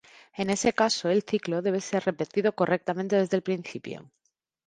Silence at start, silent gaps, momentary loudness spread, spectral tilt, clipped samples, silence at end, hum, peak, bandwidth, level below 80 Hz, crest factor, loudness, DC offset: 0.35 s; none; 14 LU; -4.5 dB/octave; under 0.1%; 0.65 s; none; -8 dBFS; 11 kHz; -66 dBFS; 20 dB; -27 LUFS; under 0.1%